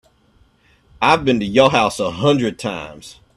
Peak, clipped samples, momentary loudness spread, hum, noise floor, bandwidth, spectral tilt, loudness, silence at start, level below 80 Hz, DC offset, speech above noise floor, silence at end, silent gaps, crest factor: 0 dBFS; under 0.1%; 12 LU; none; -56 dBFS; 13 kHz; -5 dB/octave; -16 LUFS; 1 s; -48 dBFS; under 0.1%; 39 dB; 0.25 s; none; 18 dB